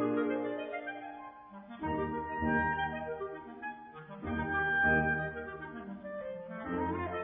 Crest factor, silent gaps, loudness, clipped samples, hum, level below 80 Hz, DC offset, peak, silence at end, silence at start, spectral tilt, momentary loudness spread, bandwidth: 18 dB; none; -35 LUFS; under 0.1%; none; -54 dBFS; under 0.1%; -18 dBFS; 0 s; 0 s; -9.5 dB/octave; 16 LU; 4 kHz